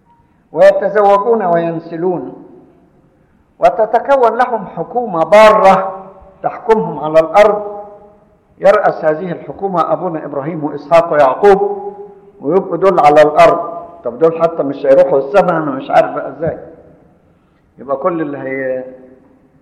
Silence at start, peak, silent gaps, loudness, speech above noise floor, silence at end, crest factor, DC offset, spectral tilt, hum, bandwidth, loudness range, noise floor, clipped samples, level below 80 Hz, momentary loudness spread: 0.55 s; 0 dBFS; none; -12 LUFS; 40 dB; 0.65 s; 12 dB; under 0.1%; -6.5 dB/octave; none; 11.5 kHz; 5 LU; -51 dBFS; under 0.1%; -48 dBFS; 15 LU